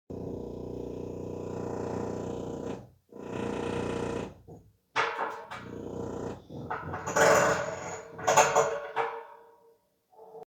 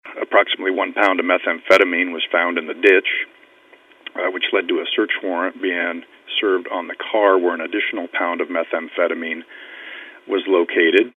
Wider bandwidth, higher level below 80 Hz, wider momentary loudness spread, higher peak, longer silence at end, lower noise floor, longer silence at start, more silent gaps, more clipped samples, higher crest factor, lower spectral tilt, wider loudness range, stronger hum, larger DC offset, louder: first, 19.5 kHz vs 9 kHz; first, -58 dBFS vs -74 dBFS; first, 18 LU vs 14 LU; second, -6 dBFS vs 0 dBFS; about the same, 0 s vs 0.1 s; first, -65 dBFS vs -50 dBFS; about the same, 0.1 s vs 0.05 s; neither; neither; first, 26 dB vs 20 dB; about the same, -3.5 dB/octave vs -3.5 dB/octave; first, 9 LU vs 5 LU; neither; neither; second, -31 LUFS vs -19 LUFS